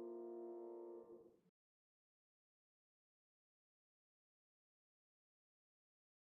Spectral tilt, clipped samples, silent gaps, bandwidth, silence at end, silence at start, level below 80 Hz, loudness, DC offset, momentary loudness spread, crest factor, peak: -5.5 dB/octave; under 0.1%; none; 2.1 kHz; 4.8 s; 0 s; under -90 dBFS; -55 LUFS; under 0.1%; 10 LU; 16 dB; -44 dBFS